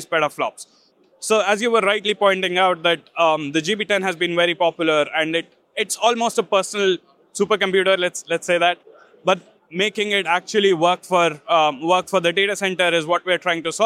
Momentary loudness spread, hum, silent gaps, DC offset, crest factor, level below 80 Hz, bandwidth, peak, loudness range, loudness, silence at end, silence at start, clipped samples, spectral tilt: 7 LU; none; none; under 0.1%; 18 dB; -72 dBFS; 15 kHz; -2 dBFS; 2 LU; -19 LUFS; 0 s; 0 s; under 0.1%; -3 dB/octave